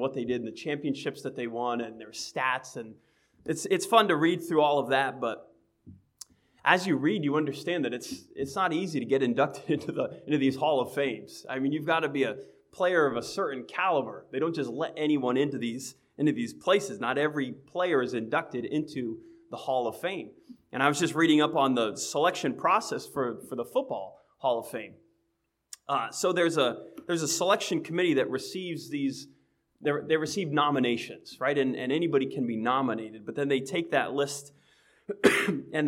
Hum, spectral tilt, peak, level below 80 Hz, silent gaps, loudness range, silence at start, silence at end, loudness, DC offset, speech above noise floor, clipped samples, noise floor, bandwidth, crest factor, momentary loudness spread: none; -4.5 dB/octave; -6 dBFS; -74 dBFS; none; 4 LU; 0 s; 0 s; -28 LUFS; under 0.1%; 49 dB; under 0.1%; -77 dBFS; 16.5 kHz; 24 dB; 13 LU